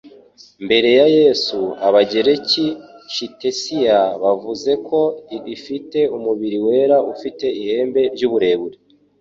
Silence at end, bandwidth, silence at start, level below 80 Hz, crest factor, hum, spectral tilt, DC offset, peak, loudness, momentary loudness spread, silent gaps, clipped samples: 0.45 s; 7.6 kHz; 0.05 s; -60 dBFS; 16 dB; none; -4.5 dB/octave; under 0.1%; -2 dBFS; -17 LUFS; 13 LU; none; under 0.1%